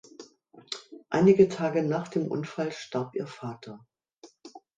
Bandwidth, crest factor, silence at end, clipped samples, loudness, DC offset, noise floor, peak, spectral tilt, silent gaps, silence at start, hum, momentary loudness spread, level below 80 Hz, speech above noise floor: 9 kHz; 22 dB; 0.2 s; under 0.1%; -27 LUFS; under 0.1%; -56 dBFS; -8 dBFS; -7 dB/octave; 4.18-4.22 s; 0.2 s; none; 18 LU; -68 dBFS; 30 dB